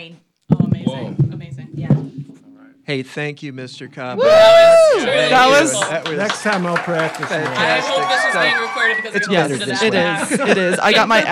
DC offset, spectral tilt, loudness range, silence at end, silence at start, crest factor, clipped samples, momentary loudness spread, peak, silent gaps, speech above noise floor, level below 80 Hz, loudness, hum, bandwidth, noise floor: under 0.1%; -4.5 dB/octave; 10 LU; 0 s; 0 s; 14 dB; under 0.1%; 18 LU; -2 dBFS; none; 31 dB; -52 dBFS; -15 LUFS; none; 14.5 kHz; -45 dBFS